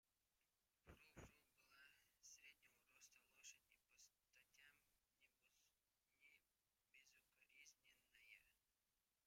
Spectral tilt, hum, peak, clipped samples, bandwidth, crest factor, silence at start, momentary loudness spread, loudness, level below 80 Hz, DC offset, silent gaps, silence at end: -2 dB/octave; 50 Hz at -100 dBFS; -50 dBFS; under 0.1%; 16 kHz; 26 dB; 0.05 s; 4 LU; -67 LUFS; -86 dBFS; under 0.1%; none; 0 s